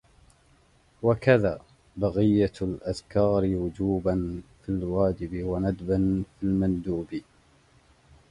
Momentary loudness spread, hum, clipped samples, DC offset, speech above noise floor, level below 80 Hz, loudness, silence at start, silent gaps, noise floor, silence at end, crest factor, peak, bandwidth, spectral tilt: 11 LU; none; under 0.1%; under 0.1%; 35 dB; -46 dBFS; -26 LUFS; 1 s; none; -61 dBFS; 1.1 s; 20 dB; -6 dBFS; 11 kHz; -8.5 dB/octave